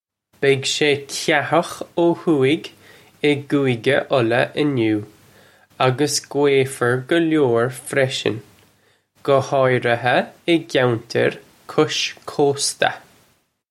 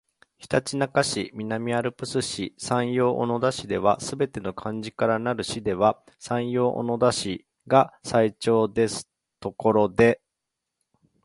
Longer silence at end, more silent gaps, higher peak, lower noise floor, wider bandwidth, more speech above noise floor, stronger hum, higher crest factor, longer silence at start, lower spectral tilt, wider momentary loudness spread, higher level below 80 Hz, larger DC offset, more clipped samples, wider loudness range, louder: second, 0.7 s vs 1.1 s; neither; about the same, -2 dBFS vs -2 dBFS; second, -61 dBFS vs -84 dBFS; first, 15 kHz vs 11.5 kHz; second, 42 dB vs 60 dB; neither; about the same, 18 dB vs 22 dB; about the same, 0.4 s vs 0.4 s; about the same, -4.5 dB/octave vs -5 dB/octave; second, 6 LU vs 10 LU; second, -64 dBFS vs -56 dBFS; neither; neither; about the same, 1 LU vs 3 LU; first, -19 LUFS vs -25 LUFS